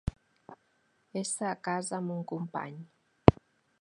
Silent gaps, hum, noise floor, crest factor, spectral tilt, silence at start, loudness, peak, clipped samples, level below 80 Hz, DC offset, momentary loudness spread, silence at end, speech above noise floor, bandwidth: none; none; -72 dBFS; 32 dB; -6 dB/octave; 0.05 s; -31 LUFS; 0 dBFS; under 0.1%; -48 dBFS; under 0.1%; 16 LU; 0.5 s; 37 dB; 11 kHz